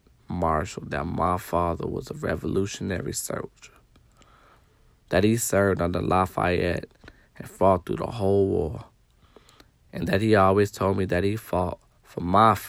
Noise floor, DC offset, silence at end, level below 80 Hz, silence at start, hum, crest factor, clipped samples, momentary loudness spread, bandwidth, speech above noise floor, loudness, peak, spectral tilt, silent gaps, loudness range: -59 dBFS; under 0.1%; 0 s; -50 dBFS; 0.3 s; none; 20 dB; under 0.1%; 13 LU; 16 kHz; 35 dB; -25 LUFS; -6 dBFS; -6 dB/octave; none; 5 LU